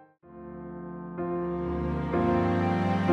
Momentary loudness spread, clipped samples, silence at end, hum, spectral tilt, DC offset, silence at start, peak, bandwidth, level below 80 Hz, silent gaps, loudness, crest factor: 16 LU; under 0.1%; 0 s; none; -9 dB/octave; under 0.1%; 0 s; -12 dBFS; 7 kHz; -44 dBFS; none; -29 LUFS; 16 dB